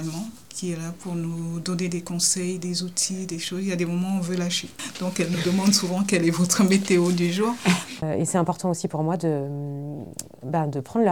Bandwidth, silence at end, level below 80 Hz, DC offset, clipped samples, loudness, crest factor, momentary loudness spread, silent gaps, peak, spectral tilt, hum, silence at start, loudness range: 18.5 kHz; 0 s; -62 dBFS; 0.3%; under 0.1%; -24 LUFS; 20 dB; 12 LU; none; -4 dBFS; -4.5 dB/octave; none; 0 s; 5 LU